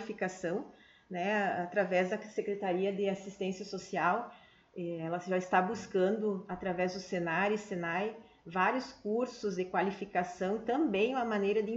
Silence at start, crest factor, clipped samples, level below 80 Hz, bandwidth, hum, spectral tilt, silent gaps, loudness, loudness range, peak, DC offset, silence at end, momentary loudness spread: 0 s; 18 dB; under 0.1%; -70 dBFS; 8 kHz; none; -6 dB/octave; none; -34 LUFS; 1 LU; -16 dBFS; under 0.1%; 0 s; 8 LU